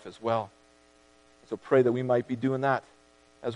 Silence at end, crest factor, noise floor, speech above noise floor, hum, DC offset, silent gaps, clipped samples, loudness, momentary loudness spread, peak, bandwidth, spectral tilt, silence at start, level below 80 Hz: 0 s; 20 dB; -60 dBFS; 33 dB; 60 Hz at -55 dBFS; under 0.1%; none; under 0.1%; -28 LUFS; 16 LU; -10 dBFS; 10.5 kHz; -8 dB/octave; 0.05 s; -72 dBFS